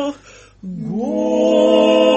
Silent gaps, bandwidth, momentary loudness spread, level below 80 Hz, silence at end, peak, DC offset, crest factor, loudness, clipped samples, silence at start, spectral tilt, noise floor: none; 8.2 kHz; 18 LU; -52 dBFS; 0 s; -2 dBFS; under 0.1%; 14 dB; -15 LUFS; under 0.1%; 0 s; -5.5 dB/octave; -38 dBFS